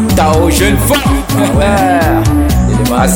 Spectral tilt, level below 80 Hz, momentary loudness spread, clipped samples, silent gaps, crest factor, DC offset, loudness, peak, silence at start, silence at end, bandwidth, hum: -5.5 dB/octave; -16 dBFS; 2 LU; under 0.1%; none; 8 dB; under 0.1%; -10 LUFS; 0 dBFS; 0 s; 0 s; over 20 kHz; none